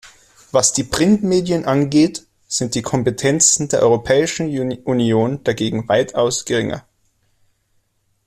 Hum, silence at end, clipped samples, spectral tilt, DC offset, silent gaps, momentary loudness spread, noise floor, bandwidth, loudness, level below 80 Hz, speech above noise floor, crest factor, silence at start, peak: none; 1.45 s; under 0.1%; -4 dB/octave; under 0.1%; none; 8 LU; -64 dBFS; 14 kHz; -17 LUFS; -48 dBFS; 47 dB; 18 dB; 0.05 s; 0 dBFS